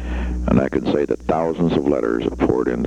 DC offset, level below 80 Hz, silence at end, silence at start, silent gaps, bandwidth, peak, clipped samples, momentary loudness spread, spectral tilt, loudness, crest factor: 0.2%; -30 dBFS; 0 s; 0 s; none; 9.4 kHz; -2 dBFS; under 0.1%; 3 LU; -8 dB/octave; -20 LUFS; 16 dB